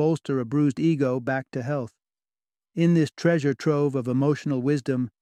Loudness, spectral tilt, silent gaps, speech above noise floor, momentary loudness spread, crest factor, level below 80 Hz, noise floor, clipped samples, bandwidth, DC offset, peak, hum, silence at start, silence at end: -24 LUFS; -8 dB/octave; none; over 67 dB; 7 LU; 16 dB; -68 dBFS; under -90 dBFS; under 0.1%; 10 kHz; under 0.1%; -8 dBFS; none; 0 s; 0.15 s